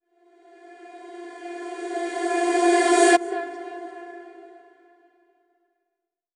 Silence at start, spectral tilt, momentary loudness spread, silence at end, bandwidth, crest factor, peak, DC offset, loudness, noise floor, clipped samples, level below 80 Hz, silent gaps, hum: 0.7 s; -0.5 dB/octave; 25 LU; 1.85 s; 11.5 kHz; 22 dB; -4 dBFS; under 0.1%; -21 LUFS; -83 dBFS; under 0.1%; -78 dBFS; none; none